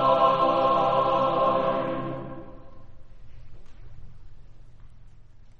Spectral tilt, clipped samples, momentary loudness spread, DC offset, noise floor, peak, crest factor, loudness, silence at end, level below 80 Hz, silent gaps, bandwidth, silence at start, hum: -7.5 dB/octave; under 0.1%; 16 LU; under 0.1%; -46 dBFS; -8 dBFS; 18 dB; -23 LUFS; 0.05 s; -48 dBFS; none; 6.8 kHz; 0 s; none